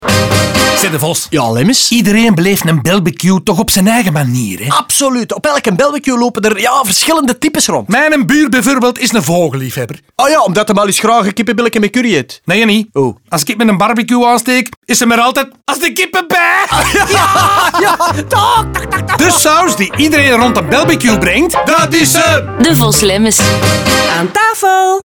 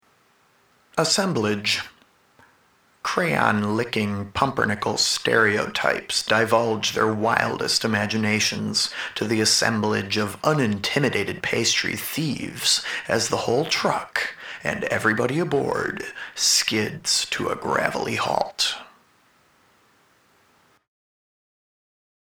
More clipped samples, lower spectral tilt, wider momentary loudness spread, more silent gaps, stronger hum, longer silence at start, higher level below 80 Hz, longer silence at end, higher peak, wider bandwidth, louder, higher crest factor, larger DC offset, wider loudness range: neither; about the same, -3.5 dB/octave vs -3 dB/octave; second, 5 LU vs 8 LU; first, 14.77-14.82 s vs none; neither; second, 0 s vs 0.95 s; first, -36 dBFS vs -58 dBFS; second, 0.05 s vs 3.35 s; about the same, 0 dBFS vs 0 dBFS; about the same, over 20 kHz vs over 20 kHz; first, -10 LUFS vs -22 LUFS; second, 10 dB vs 24 dB; neither; about the same, 2 LU vs 4 LU